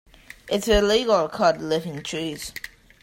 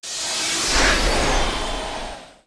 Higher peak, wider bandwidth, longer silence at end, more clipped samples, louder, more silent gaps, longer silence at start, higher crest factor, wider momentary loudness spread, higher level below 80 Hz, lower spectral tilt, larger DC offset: about the same, -6 dBFS vs -6 dBFS; first, 16 kHz vs 11 kHz; first, 0.35 s vs 0.15 s; neither; second, -23 LUFS vs -20 LUFS; neither; first, 0.45 s vs 0 s; about the same, 18 dB vs 16 dB; about the same, 15 LU vs 13 LU; second, -40 dBFS vs -28 dBFS; first, -4 dB/octave vs -2 dB/octave; neither